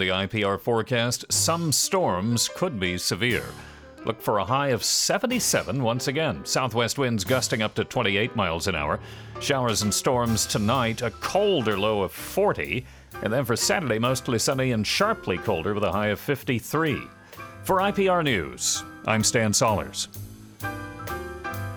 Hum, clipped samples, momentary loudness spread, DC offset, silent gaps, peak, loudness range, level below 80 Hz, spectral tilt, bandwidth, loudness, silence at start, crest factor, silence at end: none; under 0.1%; 12 LU; under 0.1%; none; -8 dBFS; 2 LU; -50 dBFS; -3.5 dB/octave; over 20 kHz; -24 LUFS; 0 s; 18 dB; 0 s